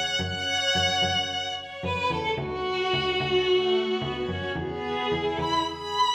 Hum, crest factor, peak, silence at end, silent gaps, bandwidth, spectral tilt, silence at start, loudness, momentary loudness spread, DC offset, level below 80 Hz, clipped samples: none; 14 dB; -12 dBFS; 0 s; none; 13.5 kHz; -4 dB/octave; 0 s; -26 LUFS; 8 LU; under 0.1%; -50 dBFS; under 0.1%